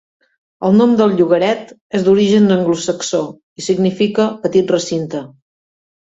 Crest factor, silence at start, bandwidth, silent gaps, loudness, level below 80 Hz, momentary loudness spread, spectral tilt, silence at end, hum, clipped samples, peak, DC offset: 14 dB; 0.6 s; 8 kHz; 1.81-1.90 s, 3.43-3.56 s; -15 LUFS; -56 dBFS; 11 LU; -6 dB/octave; 0.75 s; none; under 0.1%; 0 dBFS; under 0.1%